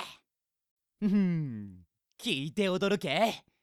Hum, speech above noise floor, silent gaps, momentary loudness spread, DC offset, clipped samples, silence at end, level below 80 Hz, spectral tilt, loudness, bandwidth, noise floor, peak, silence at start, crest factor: none; 57 dB; 0.71-0.77 s; 14 LU; under 0.1%; under 0.1%; 0.25 s; -70 dBFS; -6 dB/octave; -30 LUFS; 14.5 kHz; -87 dBFS; -14 dBFS; 0 s; 18 dB